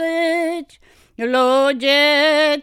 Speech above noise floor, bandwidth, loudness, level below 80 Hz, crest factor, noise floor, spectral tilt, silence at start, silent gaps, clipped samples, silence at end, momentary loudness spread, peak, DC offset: 36 dB; 15.5 kHz; -16 LUFS; -60 dBFS; 14 dB; -51 dBFS; -1.5 dB/octave; 0 s; none; under 0.1%; 0 s; 11 LU; -4 dBFS; under 0.1%